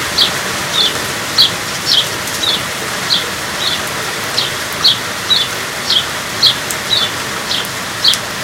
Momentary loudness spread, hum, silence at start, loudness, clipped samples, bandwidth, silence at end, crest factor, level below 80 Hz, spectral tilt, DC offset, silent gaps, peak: 7 LU; none; 0 s; -13 LUFS; under 0.1%; 17.5 kHz; 0 s; 16 dB; -44 dBFS; -1 dB/octave; under 0.1%; none; 0 dBFS